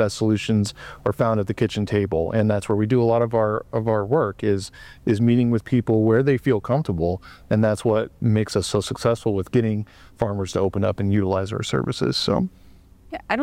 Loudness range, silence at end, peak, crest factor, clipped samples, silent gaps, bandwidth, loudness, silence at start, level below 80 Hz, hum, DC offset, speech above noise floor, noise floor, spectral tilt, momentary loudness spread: 3 LU; 0 s; -6 dBFS; 14 dB; under 0.1%; none; 13.5 kHz; -22 LUFS; 0 s; -48 dBFS; none; under 0.1%; 27 dB; -48 dBFS; -6.5 dB/octave; 8 LU